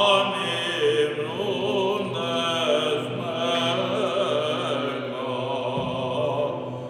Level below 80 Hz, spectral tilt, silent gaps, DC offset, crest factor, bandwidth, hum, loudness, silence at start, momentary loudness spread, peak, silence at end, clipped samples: -64 dBFS; -4.5 dB/octave; none; under 0.1%; 18 dB; 15.5 kHz; none; -25 LUFS; 0 s; 5 LU; -6 dBFS; 0 s; under 0.1%